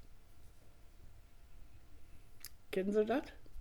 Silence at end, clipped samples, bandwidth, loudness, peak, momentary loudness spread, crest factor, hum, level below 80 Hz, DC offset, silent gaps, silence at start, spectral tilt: 0 s; under 0.1%; over 20 kHz; -37 LUFS; -22 dBFS; 20 LU; 20 dB; none; -60 dBFS; under 0.1%; none; 0 s; -6 dB/octave